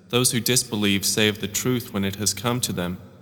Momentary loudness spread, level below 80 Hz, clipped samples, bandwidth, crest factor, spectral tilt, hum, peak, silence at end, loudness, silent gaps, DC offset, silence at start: 7 LU; -56 dBFS; under 0.1%; 19 kHz; 20 dB; -3 dB/octave; none; -4 dBFS; 0.05 s; -22 LUFS; none; under 0.1%; 0.1 s